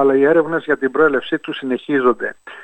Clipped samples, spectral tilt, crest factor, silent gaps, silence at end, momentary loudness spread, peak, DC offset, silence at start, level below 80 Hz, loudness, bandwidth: under 0.1%; -7 dB/octave; 14 dB; none; 0 s; 9 LU; -2 dBFS; under 0.1%; 0 s; -60 dBFS; -17 LUFS; 8.4 kHz